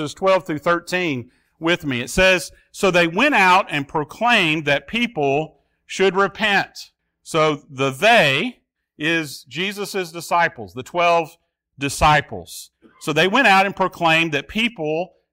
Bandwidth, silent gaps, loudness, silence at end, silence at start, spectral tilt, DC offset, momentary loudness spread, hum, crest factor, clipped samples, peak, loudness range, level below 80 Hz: 16 kHz; none; -18 LUFS; 0.25 s; 0 s; -4 dB/octave; under 0.1%; 14 LU; none; 16 dB; under 0.1%; -4 dBFS; 4 LU; -44 dBFS